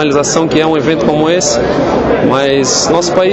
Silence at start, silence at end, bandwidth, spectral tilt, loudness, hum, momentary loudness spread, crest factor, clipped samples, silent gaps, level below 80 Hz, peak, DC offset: 0 s; 0 s; 8.4 kHz; -4 dB/octave; -10 LUFS; none; 2 LU; 10 dB; under 0.1%; none; -34 dBFS; 0 dBFS; under 0.1%